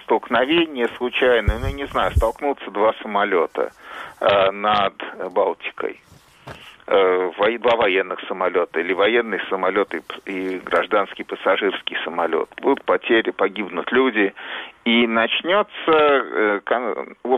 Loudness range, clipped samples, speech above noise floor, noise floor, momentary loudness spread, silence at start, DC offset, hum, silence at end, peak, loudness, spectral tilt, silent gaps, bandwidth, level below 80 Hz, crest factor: 3 LU; under 0.1%; 21 dB; -41 dBFS; 10 LU; 0.1 s; under 0.1%; none; 0 s; -4 dBFS; -20 LUFS; -6 dB/octave; none; 13 kHz; -38 dBFS; 16 dB